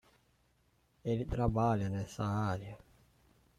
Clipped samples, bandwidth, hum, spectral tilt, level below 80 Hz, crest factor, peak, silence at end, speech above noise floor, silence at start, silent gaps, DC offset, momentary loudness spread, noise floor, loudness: under 0.1%; 13 kHz; none; -8 dB/octave; -52 dBFS; 18 dB; -20 dBFS; 0.8 s; 39 dB; 1.05 s; none; under 0.1%; 12 LU; -73 dBFS; -35 LUFS